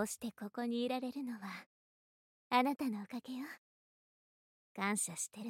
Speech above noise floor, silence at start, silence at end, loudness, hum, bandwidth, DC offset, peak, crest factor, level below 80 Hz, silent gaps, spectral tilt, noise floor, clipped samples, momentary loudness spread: over 51 dB; 0 s; 0 s; -39 LUFS; none; 16.5 kHz; under 0.1%; -18 dBFS; 24 dB; -84 dBFS; 1.66-2.50 s, 3.58-4.75 s; -3.5 dB/octave; under -90 dBFS; under 0.1%; 15 LU